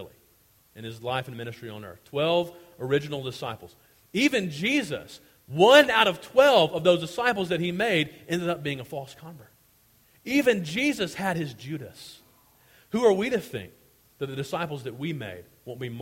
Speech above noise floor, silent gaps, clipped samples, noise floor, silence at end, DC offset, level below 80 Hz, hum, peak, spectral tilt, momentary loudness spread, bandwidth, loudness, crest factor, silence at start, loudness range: 36 dB; none; under 0.1%; -61 dBFS; 0 s; under 0.1%; -64 dBFS; none; -2 dBFS; -4.5 dB/octave; 20 LU; 16.5 kHz; -24 LUFS; 24 dB; 0 s; 9 LU